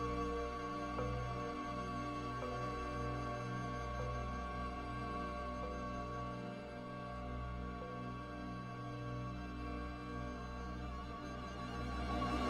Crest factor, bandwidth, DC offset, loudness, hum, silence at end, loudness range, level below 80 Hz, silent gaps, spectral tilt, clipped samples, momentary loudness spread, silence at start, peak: 16 dB; 11 kHz; under 0.1%; -44 LUFS; none; 0 s; 4 LU; -50 dBFS; none; -6.5 dB/octave; under 0.1%; 5 LU; 0 s; -28 dBFS